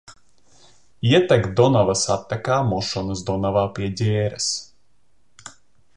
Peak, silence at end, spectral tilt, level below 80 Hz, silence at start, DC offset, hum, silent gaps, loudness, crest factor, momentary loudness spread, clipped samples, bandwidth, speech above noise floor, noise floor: -2 dBFS; 0.45 s; -5 dB/octave; -48 dBFS; 0.1 s; 0.3%; none; none; -21 LUFS; 18 dB; 9 LU; under 0.1%; 11 kHz; 48 dB; -67 dBFS